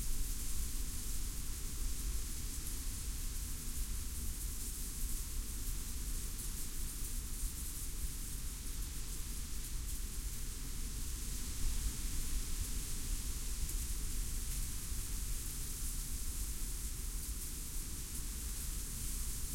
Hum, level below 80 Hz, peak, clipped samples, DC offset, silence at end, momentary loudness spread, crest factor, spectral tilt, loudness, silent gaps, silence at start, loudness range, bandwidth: none; -40 dBFS; -24 dBFS; under 0.1%; under 0.1%; 0 s; 3 LU; 14 dB; -2.5 dB/octave; -42 LUFS; none; 0 s; 2 LU; 16.5 kHz